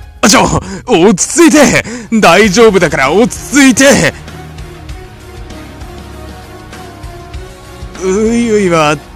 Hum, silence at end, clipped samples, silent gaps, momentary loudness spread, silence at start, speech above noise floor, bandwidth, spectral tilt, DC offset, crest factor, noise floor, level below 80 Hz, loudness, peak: none; 0.05 s; 2%; none; 24 LU; 0 s; 21 dB; over 20 kHz; -4 dB/octave; under 0.1%; 10 dB; -28 dBFS; -30 dBFS; -8 LUFS; 0 dBFS